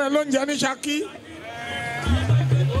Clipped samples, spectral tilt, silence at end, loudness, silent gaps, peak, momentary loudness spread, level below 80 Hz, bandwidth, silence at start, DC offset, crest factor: under 0.1%; -5.5 dB/octave; 0 s; -23 LUFS; none; -8 dBFS; 14 LU; -38 dBFS; 13 kHz; 0 s; under 0.1%; 14 dB